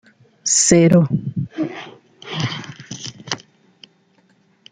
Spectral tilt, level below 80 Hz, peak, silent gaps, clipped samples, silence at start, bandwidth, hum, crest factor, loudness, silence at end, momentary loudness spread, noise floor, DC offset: -4.5 dB/octave; -52 dBFS; -2 dBFS; none; under 0.1%; 0.45 s; 9.6 kHz; none; 18 dB; -18 LUFS; 1.35 s; 21 LU; -58 dBFS; under 0.1%